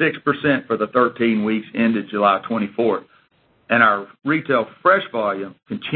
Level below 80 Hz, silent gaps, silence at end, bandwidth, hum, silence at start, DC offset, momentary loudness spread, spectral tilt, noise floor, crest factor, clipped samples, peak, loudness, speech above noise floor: -62 dBFS; none; 0 s; 4.4 kHz; none; 0 s; under 0.1%; 8 LU; -11 dB/octave; -60 dBFS; 20 dB; under 0.1%; 0 dBFS; -19 LUFS; 40 dB